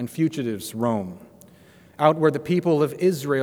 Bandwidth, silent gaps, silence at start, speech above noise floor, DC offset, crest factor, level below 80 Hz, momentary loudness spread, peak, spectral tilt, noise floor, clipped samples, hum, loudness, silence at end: over 20 kHz; none; 0 s; 29 dB; under 0.1%; 20 dB; -66 dBFS; 10 LU; -2 dBFS; -6.5 dB/octave; -51 dBFS; under 0.1%; none; -23 LUFS; 0 s